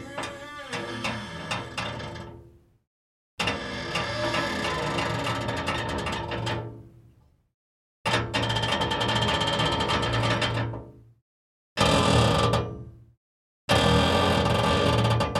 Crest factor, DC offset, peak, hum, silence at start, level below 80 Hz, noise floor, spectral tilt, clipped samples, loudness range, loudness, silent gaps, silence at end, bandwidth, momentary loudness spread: 20 dB; under 0.1%; -6 dBFS; none; 0 s; -44 dBFS; -58 dBFS; -4.5 dB/octave; under 0.1%; 9 LU; -25 LUFS; 2.87-3.37 s, 7.54-8.05 s, 11.22-11.76 s, 13.17-13.68 s; 0 s; 13.5 kHz; 14 LU